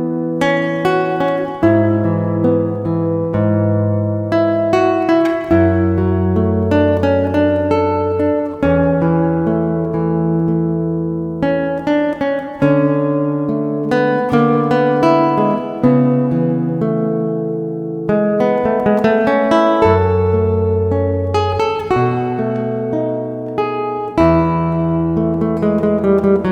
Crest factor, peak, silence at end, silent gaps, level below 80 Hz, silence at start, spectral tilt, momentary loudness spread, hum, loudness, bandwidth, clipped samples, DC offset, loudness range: 14 dB; 0 dBFS; 0 s; none; -40 dBFS; 0 s; -9 dB/octave; 6 LU; none; -15 LUFS; 8.8 kHz; under 0.1%; under 0.1%; 3 LU